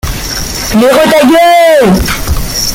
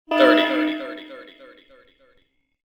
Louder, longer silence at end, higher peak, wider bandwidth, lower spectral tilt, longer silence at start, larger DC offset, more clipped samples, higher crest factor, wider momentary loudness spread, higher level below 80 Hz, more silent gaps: first, -7 LUFS vs -19 LUFS; second, 0 s vs 1.45 s; about the same, 0 dBFS vs -2 dBFS; first, 17.5 kHz vs 9.2 kHz; about the same, -4 dB/octave vs -4 dB/octave; about the same, 0.05 s vs 0.1 s; neither; neither; second, 8 dB vs 20 dB; second, 10 LU vs 25 LU; first, -20 dBFS vs -70 dBFS; neither